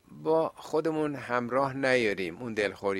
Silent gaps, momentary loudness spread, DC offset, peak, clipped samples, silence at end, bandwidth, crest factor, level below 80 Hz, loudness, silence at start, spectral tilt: none; 6 LU; under 0.1%; -10 dBFS; under 0.1%; 0 s; 13 kHz; 18 dB; -66 dBFS; -29 LUFS; 0.1 s; -5.5 dB/octave